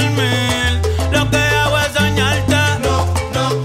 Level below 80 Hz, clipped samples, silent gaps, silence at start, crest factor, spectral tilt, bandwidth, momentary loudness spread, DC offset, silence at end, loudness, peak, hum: -26 dBFS; under 0.1%; none; 0 s; 10 dB; -4.5 dB/octave; 16 kHz; 4 LU; under 0.1%; 0 s; -15 LUFS; -4 dBFS; none